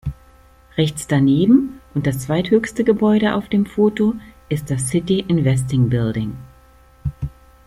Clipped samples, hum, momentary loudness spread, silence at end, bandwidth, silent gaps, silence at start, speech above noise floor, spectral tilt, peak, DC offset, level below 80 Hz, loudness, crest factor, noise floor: under 0.1%; none; 14 LU; 0.35 s; 14.5 kHz; none; 0.05 s; 32 dB; -6.5 dB/octave; -2 dBFS; under 0.1%; -42 dBFS; -18 LUFS; 16 dB; -49 dBFS